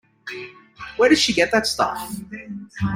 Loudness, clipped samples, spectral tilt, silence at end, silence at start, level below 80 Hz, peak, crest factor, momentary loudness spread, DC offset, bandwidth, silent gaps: -19 LUFS; under 0.1%; -3.5 dB/octave; 0 s; 0.25 s; -50 dBFS; -4 dBFS; 18 dB; 19 LU; under 0.1%; 16.5 kHz; none